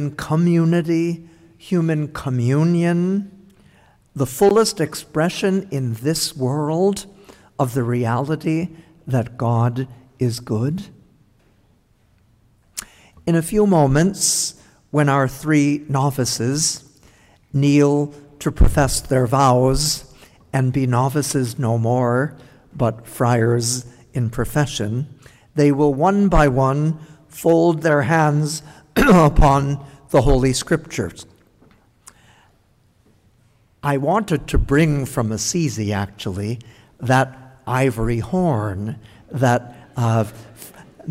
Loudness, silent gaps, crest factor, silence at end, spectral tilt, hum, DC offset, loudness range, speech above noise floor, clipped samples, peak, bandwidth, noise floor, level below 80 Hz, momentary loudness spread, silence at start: -19 LUFS; none; 14 dB; 0 s; -5.5 dB/octave; none; under 0.1%; 7 LU; 40 dB; under 0.1%; -6 dBFS; 16 kHz; -58 dBFS; -32 dBFS; 13 LU; 0 s